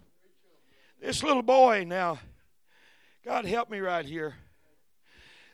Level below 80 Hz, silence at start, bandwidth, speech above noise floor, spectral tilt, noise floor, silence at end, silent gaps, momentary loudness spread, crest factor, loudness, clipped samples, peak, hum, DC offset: -62 dBFS; 1 s; 14 kHz; 45 dB; -4 dB/octave; -72 dBFS; 1.2 s; none; 19 LU; 22 dB; -27 LUFS; under 0.1%; -8 dBFS; none; under 0.1%